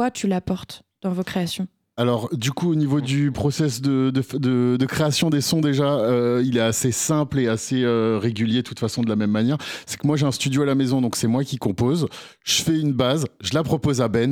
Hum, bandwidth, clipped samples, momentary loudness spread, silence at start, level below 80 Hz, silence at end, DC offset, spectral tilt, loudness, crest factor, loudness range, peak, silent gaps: none; 18.5 kHz; under 0.1%; 6 LU; 0 s; -52 dBFS; 0 s; under 0.1%; -5.5 dB/octave; -22 LUFS; 14 dB; 2 LU; -6 dBFS; none